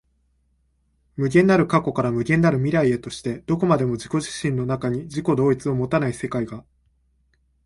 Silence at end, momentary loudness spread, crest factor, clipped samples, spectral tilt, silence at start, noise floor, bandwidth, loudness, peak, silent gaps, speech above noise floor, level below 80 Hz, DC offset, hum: 1.05 s; 10 LU; 18 dB; under 0.1%; -7 dB/octave; 1.15 s; -66 dBFS; 11.5 kHz; -22 LUFS; -4 dBFS; none; 45 dB; -52 dBFS; under 0.1%; none